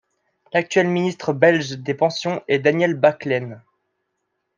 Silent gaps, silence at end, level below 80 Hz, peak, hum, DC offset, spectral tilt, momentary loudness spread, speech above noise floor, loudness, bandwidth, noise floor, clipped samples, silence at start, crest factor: none; 1 s; -68 dBFS; -2 dBFS; none; under 0.1%; -5.5 dB/octave; 8 LU; 56 dB; -20 LUFS; 9.6 kHz; -75 dBFS; under 0.1%; 0.55 s; 18 dB